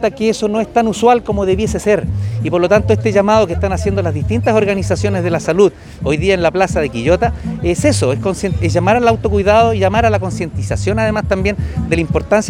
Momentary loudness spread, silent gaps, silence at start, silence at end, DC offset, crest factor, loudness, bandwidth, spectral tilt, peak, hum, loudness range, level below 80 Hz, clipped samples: 6 LU; none; 0 s; 0 s; under 0.1%; 14 dB; -14 LUFS; 14 kHz; -6 dB/octave; 0 dBFS; none; 1 LU; -30 dBFS; under 0.1%